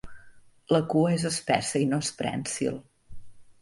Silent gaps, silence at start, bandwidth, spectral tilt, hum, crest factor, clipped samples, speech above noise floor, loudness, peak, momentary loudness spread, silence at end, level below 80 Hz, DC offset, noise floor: none; 0.05 s; 11.5 kHz; -5 dB/octave; none; 22 dB; under 0.1%; 25 dB; -27 LUFS; -6 dBFS; 7 LU; 0.1 s; -58 dBFS; under 0.1%; -51 dBFS